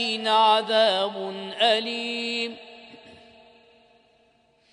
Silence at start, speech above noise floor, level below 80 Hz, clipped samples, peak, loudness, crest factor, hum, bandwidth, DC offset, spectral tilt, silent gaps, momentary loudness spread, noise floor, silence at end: 0 s; 40 dB; -76 dBFS; under 0.1%; -8 dBFS; -23 LUFS; 18 dB; none; 10.5 kHz; under 0.1%; -2.5 dB/octave; none; 14 LU; -63 dBFS; 1.6 s